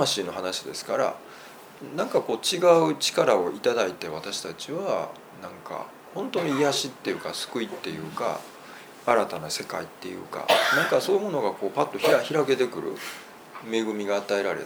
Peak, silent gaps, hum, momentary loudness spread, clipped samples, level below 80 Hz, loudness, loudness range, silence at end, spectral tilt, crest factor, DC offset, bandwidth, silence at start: -4 dBFS; none; none; 17 LU; under 0.1%; -72 dBFS; -26 LUFS; 5 LU; 0 s; -3.5 dB/octave; 22 dB; under 0.1%; over 20 kHz; 0 s